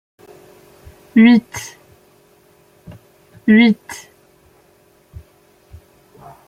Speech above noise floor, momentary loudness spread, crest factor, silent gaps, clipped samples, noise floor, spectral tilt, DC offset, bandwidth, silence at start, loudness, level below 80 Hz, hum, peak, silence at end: 41 dB; 24 LU; 18 dB; none; under 0.1%; -53 dBFS; -5.5 dB/octave; under 0.1%; 13.5 kHz; 1.15 s; -13 LUFS; -54 dBFS; none; -2 dBFS; 2.5 s